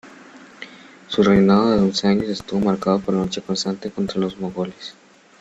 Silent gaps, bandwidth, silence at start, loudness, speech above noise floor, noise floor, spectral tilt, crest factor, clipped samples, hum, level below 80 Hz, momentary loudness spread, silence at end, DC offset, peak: none; 8 kHz; 0.05 s; -20 LUFS; 25 dB; -44 dBFS; -6 dB/octave; 18 dB; under 0.1%; none; -50 dBFS; 22 LU; 0.5 s; under 0.1%; -4 dBFS